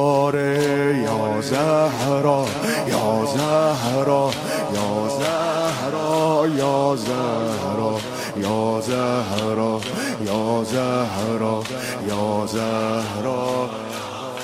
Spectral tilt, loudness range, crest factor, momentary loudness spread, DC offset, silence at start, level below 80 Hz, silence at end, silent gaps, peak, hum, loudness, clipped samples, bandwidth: -5 dB/octave; 3 LU; 16 dB; 6 LU; under 0.1%; 0 s; -56 dBFS; 0 s; none; -6 dBFS; none; -21 LUFS; under 0.1%; 16 kHz